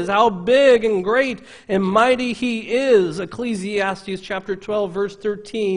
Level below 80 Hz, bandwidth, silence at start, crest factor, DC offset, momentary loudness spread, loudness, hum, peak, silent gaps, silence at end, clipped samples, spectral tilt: -54 dBFS; 10.5 kHz; 0 s; 18 dB; under 0.1%; 12 LU; -19 LUFS; none; -2 dBFS; none; 0 s; under 0.1%; -5.5 dB/octave